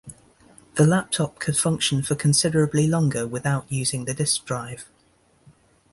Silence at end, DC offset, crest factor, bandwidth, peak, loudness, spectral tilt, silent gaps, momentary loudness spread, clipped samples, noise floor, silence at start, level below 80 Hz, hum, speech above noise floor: 1.1 s; under 0.1%; 18 dB; 11.5 kHz; -6 dBFS; -22 LUFS; -4.5 dB/octave; none; 10 LU; under 0.1%; -61 dBFS; 0.05 s; -54 dBFS; none; 39 dB